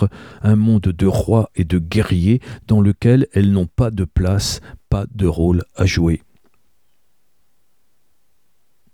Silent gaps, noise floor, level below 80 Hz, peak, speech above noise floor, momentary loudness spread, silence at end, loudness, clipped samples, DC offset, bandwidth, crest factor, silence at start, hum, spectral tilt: none; -68 dBFS; -32 dBFS; -2 dBFS; 52 dB; 8 LU; 2.75 s; -17 LUFS; under 0.1%; 0.2%; 14.5 kHz; 16 dB; 0 s; none; -7 dB/octave